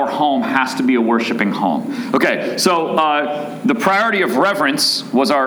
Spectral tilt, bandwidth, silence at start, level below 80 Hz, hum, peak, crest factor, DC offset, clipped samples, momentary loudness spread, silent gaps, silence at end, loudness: -3.5 dB/octave; over 20 kHz; 0 s; -68 dBFS; none; -2 dBFS; 14 dB; under 0.1%; under 0.1%; 5 LU; none; 0 s; -16 LUFS